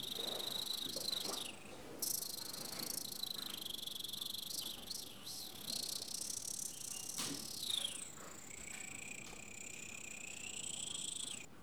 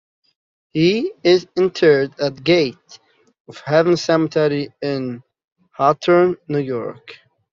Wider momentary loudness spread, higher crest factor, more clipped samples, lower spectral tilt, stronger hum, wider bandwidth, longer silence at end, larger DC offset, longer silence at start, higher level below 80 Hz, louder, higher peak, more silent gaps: second, 9 LU vs 12 LU; about the same, 20 dB vs 18 dB; neither; second, -0.5 dB/octave vs -6 dB/octave; neither; first, over 20 kHz vs 7.4 kHz; second, 0 s vs 0.35 s; first, 0.1% vs under 0.1%; second, 0 s vs 0.75 s; second, -74 dBFS vs -60 dBFS; second, -42 LUFS vs -18 LUFS; second, -26 dBFS vs -2 dBFS; second, none vs 3.40-3.45 s, 5.52-5.56 s